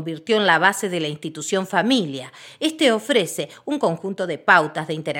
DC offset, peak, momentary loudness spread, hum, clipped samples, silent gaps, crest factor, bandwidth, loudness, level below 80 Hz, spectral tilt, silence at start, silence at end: under 0.1%; 0 dBFS; 12 LU; none; under 0.1%; none; 20 dB; 17 kHz; -20 LUFS; -76 dBFS; -4 dB/octave; 0 s; 0 s